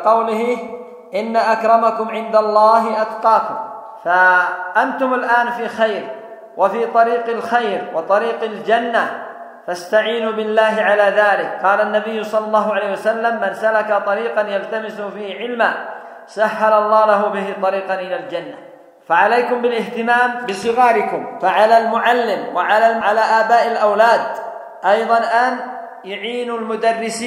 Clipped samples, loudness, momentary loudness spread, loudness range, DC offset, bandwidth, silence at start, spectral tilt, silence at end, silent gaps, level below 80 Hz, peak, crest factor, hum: under 0.1%; -16 LUFS; 14 LU; 4 LU; under 0.1%; 13.5 kHz; 0 s; -4 dB/octave; 0 s; none; -72 dBFS; 0 dBFS; 16 dB; none